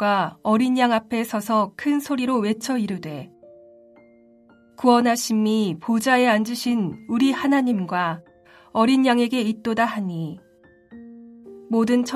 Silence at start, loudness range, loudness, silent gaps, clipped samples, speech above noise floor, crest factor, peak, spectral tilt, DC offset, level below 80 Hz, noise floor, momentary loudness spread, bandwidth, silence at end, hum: 0 s; 4 LU; -21 LUFS; none; under 0.1%; 33 dB; 16 dB; -6 dBFS; -5 dB/octave; under 0.1%; -64 dBFS; -53 dBFS; 10 LU; 15.5 kHz; 0 s; none